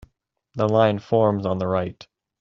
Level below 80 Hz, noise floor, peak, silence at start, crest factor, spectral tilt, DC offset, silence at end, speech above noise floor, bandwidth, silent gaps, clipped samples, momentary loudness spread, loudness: -58 dBFS; -66 dBFS; -4 dBFS; 0.55 s; 20 dB; -6.5 dB/octave; under 0.1%; 0.5 s; 45 dB; 7.2 kHz; none; under 0.1%; 10 LU; -21 LUFS